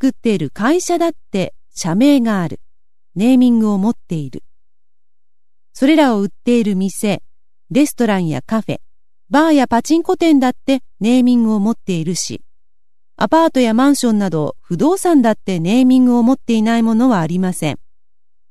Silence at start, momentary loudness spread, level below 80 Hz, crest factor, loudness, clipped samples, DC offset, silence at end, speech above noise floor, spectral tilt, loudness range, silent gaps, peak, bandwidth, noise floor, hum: 0 s; 11 LU; -54 dBFS; 14 dB; -15 LUFS; under 0.1%; 2%; 0 s; over 76 dB; -5.5 dB/octave; 4 LU; none; 0 dBFS; 13.5 kHz; under -90 dBFS; none